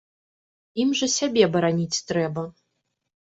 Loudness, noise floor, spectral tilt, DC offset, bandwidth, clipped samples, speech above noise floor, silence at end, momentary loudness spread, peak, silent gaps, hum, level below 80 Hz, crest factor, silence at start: -23 LUFS; -77 dBFS; -4 dB/octave; under 0.1%; 8.2 kHz; under 0.1%; 54 dB; 0.75 s; 13 LU; -4 dBFS; none; none; -64 dBFS; 20 dB; 0.75 s